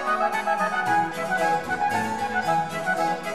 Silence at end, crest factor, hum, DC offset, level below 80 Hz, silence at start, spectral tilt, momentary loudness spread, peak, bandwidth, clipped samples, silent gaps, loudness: 0 s; 14 dB; none; 0.4%; -58 dBFS; 0 s; -4 dB/octave; 3 LU; -10 dBFS; 13.5 kHz; under 0.1%; none; -24 LUFS